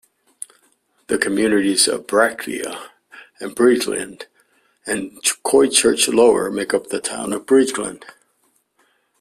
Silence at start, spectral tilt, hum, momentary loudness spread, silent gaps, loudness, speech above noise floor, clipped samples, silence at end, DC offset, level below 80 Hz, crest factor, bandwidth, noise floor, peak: 1.1 s; -2.5 dB/octave; none; 20 LU; none; -18 LUFS; 46 dB; under 0.1%; 1.15 s; under 0.1%; -58 dBFS; 20 dB; 15 kHz; -64 dBFS; 0 dBFS